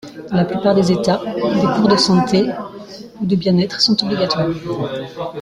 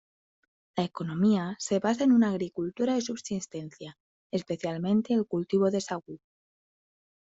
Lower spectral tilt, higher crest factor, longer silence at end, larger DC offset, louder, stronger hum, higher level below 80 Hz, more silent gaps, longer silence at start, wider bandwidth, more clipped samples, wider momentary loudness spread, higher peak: about the same, -5.5 dB/octave vs -6 dB/octave; about the same, 16 dB vs 16 dB; second, 0 s vs 1.15 s; neither; first, -16 LUFS vs -28 LUFS; neither; first, -50 dBFS vs -70 dBFS; second, none vs 4.00-4.30 s; second, 0.05 s vs 0.75 s; first, 11.5 kHz vs 8 kHz; neither; second, 12 LU vs 16 LU; first, 0 dBFS vs -12 dBFS